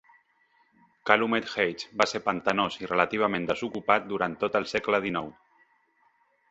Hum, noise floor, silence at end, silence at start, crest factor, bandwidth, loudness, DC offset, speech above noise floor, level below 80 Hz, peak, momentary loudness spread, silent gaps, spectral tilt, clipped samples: none; -67 dBFS; 1.2 s; 1.05 s; 26 dB; 8.2 kHz; -27 LUFS; under 0.1%; 40 dB; -64 dBFS; -2 dBFS; 6 LU; none; -4.5 dB/octave; under 0.1%